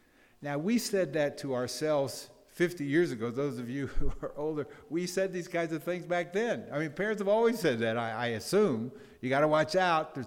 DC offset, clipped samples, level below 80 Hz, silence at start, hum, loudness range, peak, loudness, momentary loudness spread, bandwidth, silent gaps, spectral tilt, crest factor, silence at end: under 0.1%; under 0.1%; -46 dBFS; 0.4 s; none; 5 LU; -12 dBFS; -31 LUFS; 10 LU; 17.5 kHz; none; -5 dB/octave; 18 dB; 0 s